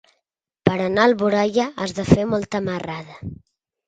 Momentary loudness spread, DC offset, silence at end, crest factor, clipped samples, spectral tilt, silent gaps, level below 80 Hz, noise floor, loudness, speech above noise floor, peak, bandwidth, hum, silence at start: 15 LU; under 0.1%; 0.55 s; 22 dB; under 0.1%; -6.5 dB/octave; none; -46 dBFS; -77 dBFS; -20 LUFS; 57 dB; 0 dBFS; 9.2 kHz; none; 0.65 s